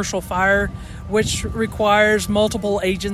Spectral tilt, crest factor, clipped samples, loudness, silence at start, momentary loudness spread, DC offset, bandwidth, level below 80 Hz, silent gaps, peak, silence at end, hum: -4 dB/octave; 16 dB; under 0.1%; -19 LUFS; 0 s; 8 LU; under 0.1%; 15 kHz; -36 dBFS; none; -4 dBFS; 0 s; none